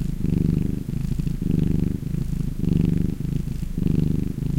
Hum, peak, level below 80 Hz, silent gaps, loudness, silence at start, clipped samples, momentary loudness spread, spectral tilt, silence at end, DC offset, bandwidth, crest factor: none; -6 dBFS; -30 dBFS; none; -24 LUFS; 0 s; under 0.1%; 5 LU; -9 dB/octave; 0 s; under 0.1%; 16 kHz; 16 dB